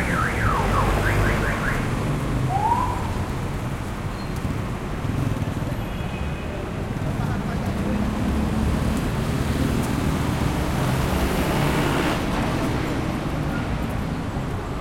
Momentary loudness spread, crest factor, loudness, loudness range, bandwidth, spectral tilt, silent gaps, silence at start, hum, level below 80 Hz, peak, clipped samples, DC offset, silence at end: 7 LU; 14 dB; -24 LUFS; 5 LU; 16.5 kHz; -6 dB/octave; none; 0 s; none; -30 dBFS; -8 dBFS; under 0.1%; under 0.1%; 0 s